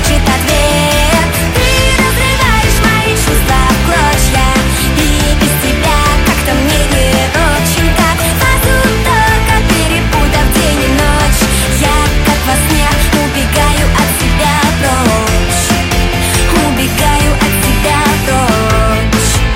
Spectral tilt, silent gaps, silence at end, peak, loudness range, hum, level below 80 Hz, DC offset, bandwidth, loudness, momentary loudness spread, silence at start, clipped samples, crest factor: -4 dB/octave; none; 0 s; 0 dBFS; 1 LU; none; -14 dBFS; under 0.1%; 16.5 kHz; -10 LUFS; 2 LU; 0 s; under 0.1%; 10 dB